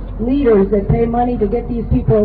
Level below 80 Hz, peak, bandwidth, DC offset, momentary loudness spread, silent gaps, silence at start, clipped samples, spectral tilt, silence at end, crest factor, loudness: -24 dBFS; -2 dBFS; 4.7 kHz; 0.2%; 6 LU; none; 0 s; under 0.1%; -12.5 dB/octave; 0 s; 12 dB; -15 LUFS